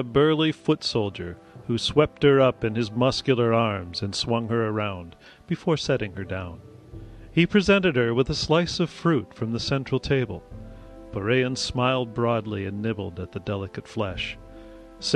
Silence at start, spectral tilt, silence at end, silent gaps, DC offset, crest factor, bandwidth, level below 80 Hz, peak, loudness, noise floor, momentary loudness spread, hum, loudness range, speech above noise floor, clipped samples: 0 s; -5.5 dB/octave; 0 s; none; under 0.1%; 20 dB; 11 kHz; -48 dBFS; -4 dBFS; -24 LUFS; -44 dBFS; 17 LU; none; 5 LU; 20 dB; under 0.1%